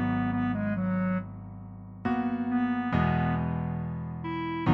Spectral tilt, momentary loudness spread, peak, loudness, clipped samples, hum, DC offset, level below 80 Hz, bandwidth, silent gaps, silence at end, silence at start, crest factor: -10 dB/octave; 13 LU; -10 dBFS; -30 LUFS; under 0.1%; none; under 0.1%; -48 dBFS; 5.2 kHz; none; 0 s; 0 s; 18 dB